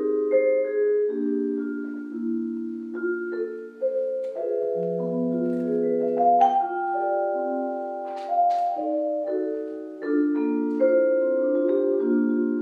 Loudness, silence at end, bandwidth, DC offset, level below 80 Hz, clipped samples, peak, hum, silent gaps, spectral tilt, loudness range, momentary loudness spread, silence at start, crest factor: -25 LUFS; 0 s; 6.4 kHz; under 0.1%; -88 dBFS; under 0.1%; -8 dBFS; none; none; -9 dB/octave; 5 LU; 10 LU; 0 s; 16 dB